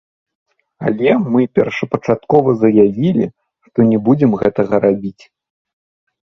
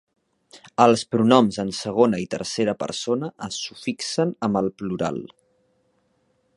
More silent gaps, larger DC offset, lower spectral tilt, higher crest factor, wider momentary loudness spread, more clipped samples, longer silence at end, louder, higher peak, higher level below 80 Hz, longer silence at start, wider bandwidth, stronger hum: neither; neither; first, -9 dB/octave vs -5 dB/octave; second, 16 dB vs 22 dB; about the same, 10 LU vs 12 LU; neither; about the same, 1.2 s vs 1.3 s; first, -15 LUFS vs -22 LUFS; about the same, 0 dBFS vs 0 dBFS; first, -52 dBFS vs -60 dBFS; first, 0.8 s vs 0.55 s; second, 6.4 kHz vs 11.5 kHz; neither